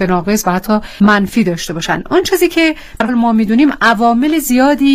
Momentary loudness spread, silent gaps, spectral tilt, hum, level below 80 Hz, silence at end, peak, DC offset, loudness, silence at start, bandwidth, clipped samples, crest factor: 6 LU; none; -5 dB/octave; none; -36 dBFS; 0 s; 0 dBFS; under 0.1%; -12 LUFS; 0 s; 16 kHz; under 0.1%; 12 dB